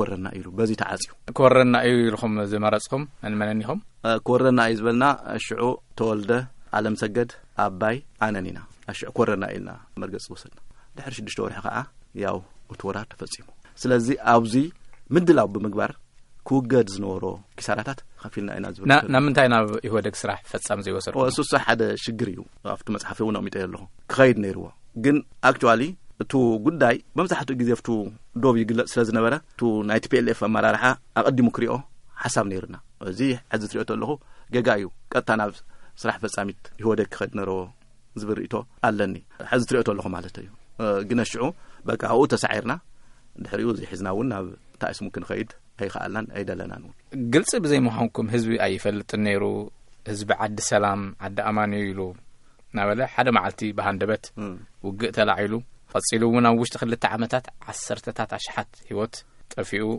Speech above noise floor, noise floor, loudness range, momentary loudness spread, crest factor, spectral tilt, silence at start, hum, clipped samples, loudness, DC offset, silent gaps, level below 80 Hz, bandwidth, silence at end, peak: 24 dB; -48 dBFS; 7 LU; 15 LU; 24 dB; -5.5 dB/octave; 0 s; none; under 0.1%; -24 LUFS; under 0.1%; none; -54 dBFS; 11.5 kHz; 0 s; 0 dBFS